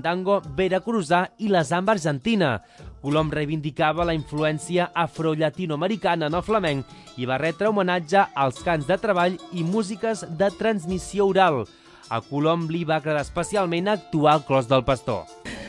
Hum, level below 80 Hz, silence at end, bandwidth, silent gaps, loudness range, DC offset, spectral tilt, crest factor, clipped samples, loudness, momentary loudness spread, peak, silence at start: none; -48 dBFS; 0 s; 11.5 kHz; none; 1 LU; under 0.1%; -6 dB/octave; 18 dB; under 0.1%; -23 LUFS; 7 LU; -6 dBFS; 0 s